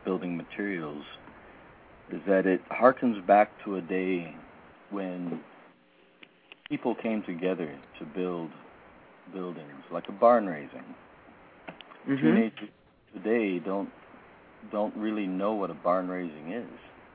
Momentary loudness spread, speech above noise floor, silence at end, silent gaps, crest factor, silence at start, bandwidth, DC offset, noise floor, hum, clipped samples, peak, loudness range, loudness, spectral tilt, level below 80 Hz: 23 LU; 32 dB; 0.25 s; none; 24 dB; 0.05 s; 4.7 kHz; under 0.1%; -61 dBFS; none; under 0.1%; -6 dBFS; 8 LU; -29 LUFS; -10.5 dB/octave; -70 dBFS